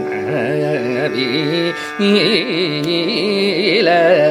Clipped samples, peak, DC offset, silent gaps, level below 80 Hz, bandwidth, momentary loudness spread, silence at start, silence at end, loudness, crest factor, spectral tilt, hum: under 0.1%; 0 dBFS; under 0.1%; none; -62 dBFS; 15 kHz; 6 LU; 0 s; 0 s; -15 LUFS; 14 dB; -5.5 dB/octave; none